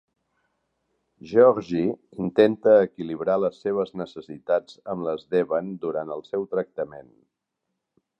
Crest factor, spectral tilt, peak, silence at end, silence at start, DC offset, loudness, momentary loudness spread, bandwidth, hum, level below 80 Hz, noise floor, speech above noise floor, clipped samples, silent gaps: 22 dB; -8 dB/octave; -4 dBFS; 1.2 s; 1.25 s; under 0.1%; -24 LUFS; 14 LU; 7 kHz; none; -64 dBFS; -81 dBFS; 58 dB; under 0.1%; none